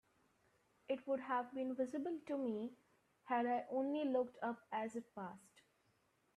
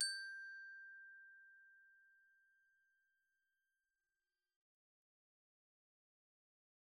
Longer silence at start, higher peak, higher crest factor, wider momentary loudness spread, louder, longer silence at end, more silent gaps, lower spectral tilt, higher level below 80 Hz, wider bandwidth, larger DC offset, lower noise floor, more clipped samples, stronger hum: first, 0.9 s vs 0 s; about the same, -26 dBFS vs -26 dBFS; second, 16 dB vs 30 dB; second, 12 LU vs 20 LU; first, -42 LUFS vs -50 LUFS; second, 0.75 s vs 4.6 s; neither; first, -6 dB/octave vs 7.5 dB/octave; about the same, -88 dBFS vs under -90 dBFS; first, 12 kHz vs 10 kHz; neither; second, -79 dBFS vs under -90 dBFS; neither; neither